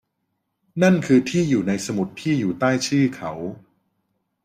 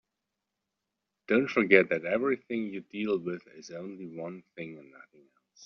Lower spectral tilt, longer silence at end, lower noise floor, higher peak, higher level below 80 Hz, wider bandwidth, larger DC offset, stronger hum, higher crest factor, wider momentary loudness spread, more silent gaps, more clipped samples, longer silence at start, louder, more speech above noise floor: first, -6 dB/octave vs -4.5 dB/octave; first, 0.85 s vs 0 s; second, -75 dBFS vs -86 dBFS; about the same, -4 dBFS vs -6 dBFS; first, -60 dBFS vs -74 dBFS; first, 15 kHz vs 6.6 kHz; neither; neither; second, 18 dB vs 26 dB; second, 12 LU vs 21 LU; neither; neither; second, 0.75 s vs 1.3 s; first, -21 LUFS vs -28 LUFS; about the same, 55 dB vs 56 dB